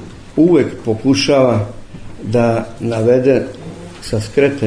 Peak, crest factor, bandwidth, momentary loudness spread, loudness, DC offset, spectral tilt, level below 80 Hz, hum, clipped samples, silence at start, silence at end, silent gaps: 0 dBFS; 14 dB; 10.5 kHz; 18 LU; -15 LUFS; under 0.1%; -6.5 dB/octave; -40 dBFS; none; under 0.1%; 0 s; 0 s; none